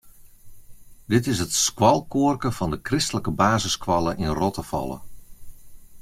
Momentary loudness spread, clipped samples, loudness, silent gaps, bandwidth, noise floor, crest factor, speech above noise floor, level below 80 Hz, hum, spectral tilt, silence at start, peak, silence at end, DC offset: 10 LU; under 0.1%; -23 LUFS; none; 16.5 kHz; -44 dBFS; 22 dB; 22 dB; -44 dBFS; none; -4.5 dB/octave; 0.05 s; -2 dBFS; 0 s; under 0.1%